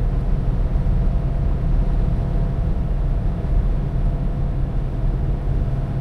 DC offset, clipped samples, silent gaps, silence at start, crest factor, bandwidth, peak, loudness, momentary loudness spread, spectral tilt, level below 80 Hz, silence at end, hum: under 0.1%; under 0.1%; none; 0 s; 10 dB; 4.2 kHz; -8 dBFS; -23 LUFS; 2 LU; -10 dB/octave; -20 dBFS; 0 s; none